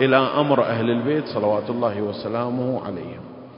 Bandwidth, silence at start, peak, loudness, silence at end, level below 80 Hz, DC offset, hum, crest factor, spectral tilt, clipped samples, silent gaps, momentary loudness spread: 5.4 kHz; 0 s; -2 dBFS; -22 LUFS; 0 s; -60 dBFS; under 0.1%; none; 18 dB; -11 dB/octave; under 0.1%; none; 13 LU